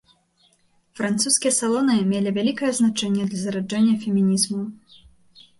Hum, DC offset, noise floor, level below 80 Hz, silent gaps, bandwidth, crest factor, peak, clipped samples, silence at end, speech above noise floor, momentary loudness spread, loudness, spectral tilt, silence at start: none; under 0.1%; -62 dBFS; -64 dBFS; none; 11.5 kHz; 16 dB; -6 dBFS; under 0.1%; 0.85 s; 41 dB; 7 LU; -21 LUFS; -4 dB/octave; 0.95 s